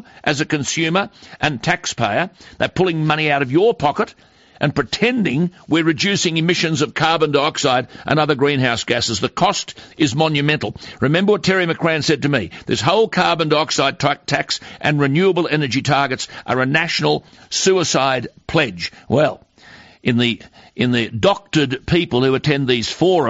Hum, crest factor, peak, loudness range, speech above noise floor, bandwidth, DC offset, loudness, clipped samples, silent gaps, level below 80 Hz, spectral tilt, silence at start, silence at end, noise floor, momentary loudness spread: none; 16 dB; -2 dBFS; 2 LU; 27 dB; 8 kHz; under 0.1%; -17 LUFS; under 0.1%; none; -48 dBFS; -3.5 dB/octave; 0.25 s; 0 s; -44 dBFS; 6 LU